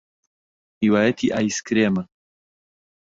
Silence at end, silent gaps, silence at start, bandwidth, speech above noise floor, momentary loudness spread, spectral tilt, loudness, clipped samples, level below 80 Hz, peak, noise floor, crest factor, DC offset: 1 s; none; 0.8 s; 7.8 kHz; over 70 dB; 7 LU; -5 dB/octave; -21 LUFS; under 0.1%; -58 dBFS; -6 dBFS; under -90 dBFS; 18 dB; under 0.1%